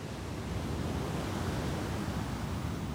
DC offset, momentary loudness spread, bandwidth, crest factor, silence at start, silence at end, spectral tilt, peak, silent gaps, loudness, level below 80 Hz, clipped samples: under 0.1%; 3 LU; 16 kHz; 14 dB; 0 s; 0 s; -6 dB/octave; -22 dBFS; none; -36 LUFS; -44 dBFS; under 0.1%